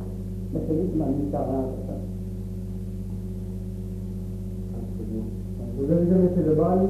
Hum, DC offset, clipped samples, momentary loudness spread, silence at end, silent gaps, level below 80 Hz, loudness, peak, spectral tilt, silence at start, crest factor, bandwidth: 50 Hz at -35 dBFS; under 0.1%; under 0.1%; 13 LU; 0 s; none; -38 dBFS; -27 LUFS; -8 dBFS; -10.5 dB/octave; 0 s; 18 dB; 13.5 kHz